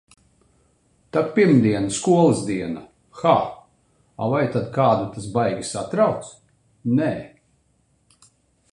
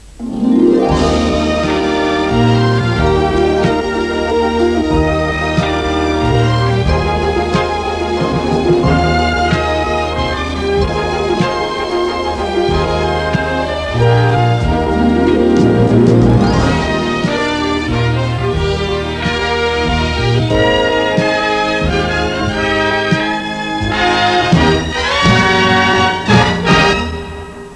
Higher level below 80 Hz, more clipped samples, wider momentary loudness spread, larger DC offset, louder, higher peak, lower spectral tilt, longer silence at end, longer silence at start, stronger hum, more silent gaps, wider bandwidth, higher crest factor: second, -56 dBFS vs -26 dBFS; neither; first, 15 LU vs 6 LU; second, under 0.1% vs 0.2%; second, -21 LUFS vs -13 LUFS; second, -4 dBFS vs 0 dBFS; about the same, -6.5 dB/octave vs -6 dB/octave; first, 1.45 s vs 0 s; first, 1.15 s vs 0 s; neither; neither; about the same, 11 kHz vs 11 kHz; first, 20 dB vs 12 dB